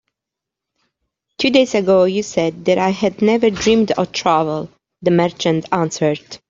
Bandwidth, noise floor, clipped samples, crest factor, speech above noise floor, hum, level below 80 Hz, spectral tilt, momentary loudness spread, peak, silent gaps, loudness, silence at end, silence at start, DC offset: 7.8 kHz; -84 dBFS; under 0.1%; 16 dB; 68 dB; none; -52 dBFS; -5 dB/octave; 6 LU; 0 dBFS; none; -16 LUFS; 0.15 s; 1.4 s; under 0.1%